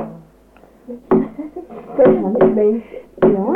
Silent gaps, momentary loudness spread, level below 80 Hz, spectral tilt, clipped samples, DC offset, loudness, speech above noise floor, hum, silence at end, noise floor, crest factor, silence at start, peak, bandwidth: none; 21 LU; -48 dBFS; -10.5 dB/octave; under 0.1%; under 0.1%; -16 LUFS; 33 dB; none; 0 s; -47 dBFS; 16 dB; 0 s; -2 dBFS; 3.7 kHz